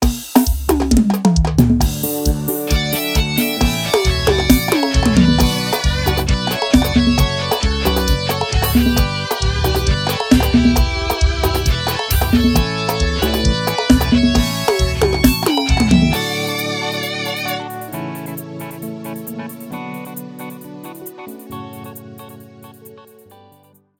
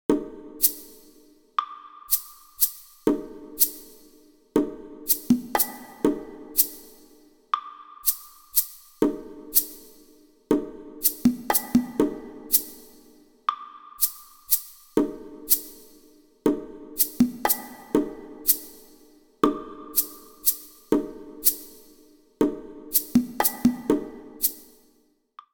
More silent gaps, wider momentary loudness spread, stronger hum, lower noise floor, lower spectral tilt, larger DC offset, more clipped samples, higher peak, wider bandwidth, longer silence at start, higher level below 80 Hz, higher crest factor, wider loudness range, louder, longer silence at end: neither; about the same, 16 LU vs 17 LU; neither; second, -51 dBFS vs -64 dBFS; first, -5 dB/octave vs -3 dB/octave; neither; neither; first, 0 dBFS vs -4 dBFS; about the same, 18.5 kHz vs over 20 kHz; about the same, 0 s vs 0.1 s; first, -22 dBFS vs -56 dBFS; second, 16 dB vs 24 dB; first, 15 LU vs 2 LU; first, -16 LUFS vs -25 LUFS; about the same, 1 s vs 0.9 s